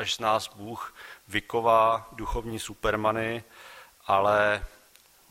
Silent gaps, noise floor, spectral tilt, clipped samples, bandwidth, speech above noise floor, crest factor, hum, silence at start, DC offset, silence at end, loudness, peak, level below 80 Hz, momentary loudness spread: none; -58 dBFS; -4 dB/octave; under 0.1%; 16 kHz; 31 dB; 18 dB; none; 0 s; under 0.1%; 0.6 s; -26 LUFS; -8 dBFS; -46 dBFS; 23 LU